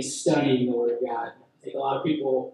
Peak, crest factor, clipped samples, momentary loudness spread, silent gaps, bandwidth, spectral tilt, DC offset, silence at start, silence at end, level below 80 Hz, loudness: -10 dBFS; 16 dB; under 0.1%; 14 LU; none; 12 kHz; -5 dB/octave; under 0.1%; 0 s; 0.05 s; -76 dBFS; -25 LUFS